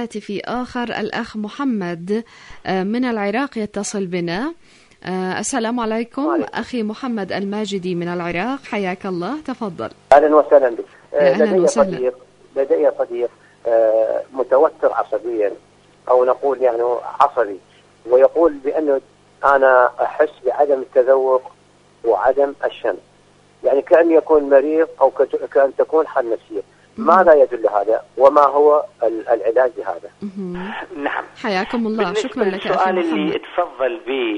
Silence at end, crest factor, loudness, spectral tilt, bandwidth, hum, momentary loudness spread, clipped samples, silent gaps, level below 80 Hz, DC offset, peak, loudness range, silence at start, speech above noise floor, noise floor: 0 s; 18 dB; -18 LUFS; -5.5 dB/octave; 10.5 kHz; none; 13 LU; under 0.1%; none; -56 dBFS; under 0.1%; 0 dBFS; 7 LU; 0 s; 35 dB; -52 dBFS